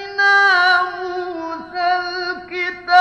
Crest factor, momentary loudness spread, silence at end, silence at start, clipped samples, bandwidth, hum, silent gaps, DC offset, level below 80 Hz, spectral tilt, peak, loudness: 16 dB; 14 LU; 0 s; 0 s; under 0.1%; 10 kHz; none; none; under 0.1%; -58 dBFS; -2 dB/octave; -2 dBFS; -17 LUFS